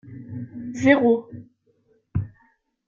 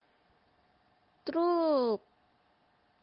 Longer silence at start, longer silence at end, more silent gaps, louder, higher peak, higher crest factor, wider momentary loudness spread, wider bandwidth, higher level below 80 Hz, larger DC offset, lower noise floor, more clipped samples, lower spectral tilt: second, 0.05 s vs 1.25 s; second, 0.6 s vs 1.05 s; neither; first, -22 LUFS vs -31 LUFS; first, -2 dBFS vs -20 dBFS; first, 22 dB vs 16 dB; first, 23 LU vs 10 LU; first, 7.4 kHz vs 5.6 kHz; first, -54 dBFS vs -80 dBFS; neither; second, -64 dBFS vs -70 dBFS; neither; second, -7 dB/octave vs -8.5 dB/octave